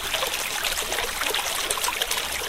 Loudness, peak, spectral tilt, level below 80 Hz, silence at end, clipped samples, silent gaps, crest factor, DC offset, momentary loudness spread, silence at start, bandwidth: -24 LUFS; -4 dBFS; 0.5 dB/octave; -44 dBFS; 0 s; under 0.1%; none; 22 dB; 0.4%; 1 LU; 0 s; 16.5 kHz